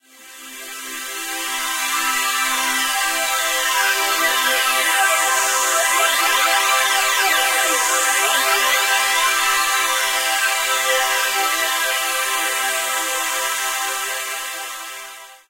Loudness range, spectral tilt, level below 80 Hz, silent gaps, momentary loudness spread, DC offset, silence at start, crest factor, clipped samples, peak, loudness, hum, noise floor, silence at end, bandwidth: 5 LU; 3.5 dB/octave; -60 dBFS; none; 11 LU; under 0.1%; 0.2 s; 14 dB; under 0.1%; -4 dBFS; -17 LUFS; none; -40 dBFS; 0.15 s; 16 kHz